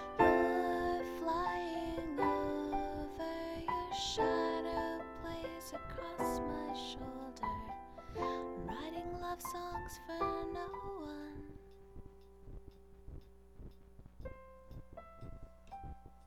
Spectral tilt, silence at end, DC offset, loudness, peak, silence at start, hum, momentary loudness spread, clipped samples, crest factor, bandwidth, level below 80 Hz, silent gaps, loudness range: -5 dB/octave; 0 s; under 0.1%; -39 LUFS; -16 dBFS; 0 s; none; 22 LU; under 0.1%; 24 dB; 16 kHz; -54 dBFS; none; 18 LU